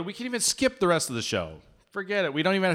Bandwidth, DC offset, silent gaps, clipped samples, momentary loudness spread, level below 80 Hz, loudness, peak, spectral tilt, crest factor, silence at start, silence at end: 17 kHz; under 0.1%; none; under 0.1%; 12 LU; -58 dBFS; -26 LUFS; -10 dBFS; -3.5 dB/octave; 16 dB; 0 s; 0 s